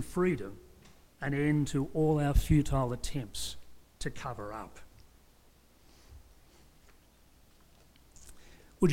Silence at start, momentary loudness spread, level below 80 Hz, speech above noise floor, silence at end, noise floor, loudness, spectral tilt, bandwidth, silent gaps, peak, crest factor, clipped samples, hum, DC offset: 0 s; 20 LU; -42 dBFS; 32 dB; 0 s; -62 dBFS; -32 LUFS; -6.5 dB/octave; 16.5 kHz; none; -14 dBFS; 20 dB; under 0.1%; none; under 0.1%